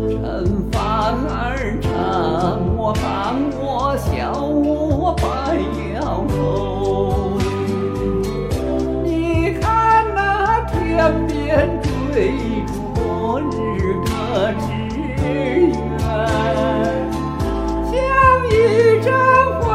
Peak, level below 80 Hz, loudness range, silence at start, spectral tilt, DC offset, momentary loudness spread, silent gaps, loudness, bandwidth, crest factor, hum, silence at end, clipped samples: -2 dBFS; -28 dBFS; 4 LU; 0 s; -7 dB/octave; under 0.1%; 8 LU; none; -18 LUFS; 15.5 kHz; 16 dB; none; 0 s; under 0.1%